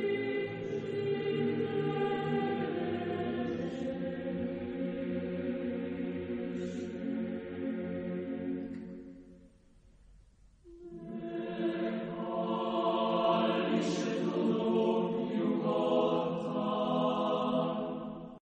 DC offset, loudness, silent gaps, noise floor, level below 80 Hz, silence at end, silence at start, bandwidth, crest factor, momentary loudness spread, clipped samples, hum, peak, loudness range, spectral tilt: under 0.1%; -34 LUFS; none; -61 dBFS; -66 dBFS; 0.05 s; 0 s; 8.6 kHz; 18 dB; 9 LU; under 0.1%; none; -16 dBFS; 10 LU; -7 dB/octave